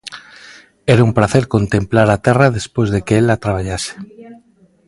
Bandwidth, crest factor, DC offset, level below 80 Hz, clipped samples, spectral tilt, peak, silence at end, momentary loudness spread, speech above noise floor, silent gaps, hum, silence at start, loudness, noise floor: 11.5 kHz; 16 dB; under 0.1%; -38 dBFS; under 0.1%; -6.5 dB/octave; 0 dBFS; 0.55 s; 16 LU; 37 dB; none; none; 0.05 s; -15 LUFS; -51 dBFS